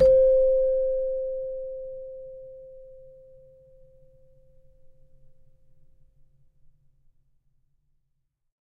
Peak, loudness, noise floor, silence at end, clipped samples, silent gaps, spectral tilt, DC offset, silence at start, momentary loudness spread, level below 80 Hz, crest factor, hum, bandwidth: -10 dBFS; -24 LUFS; -74 dBFS; 5.65 s; under 0.1%; none; -8 dB/octave; under 0.1%; 0 s; 27 LU; -48 dBFS; 18 dB; none; 5 kHz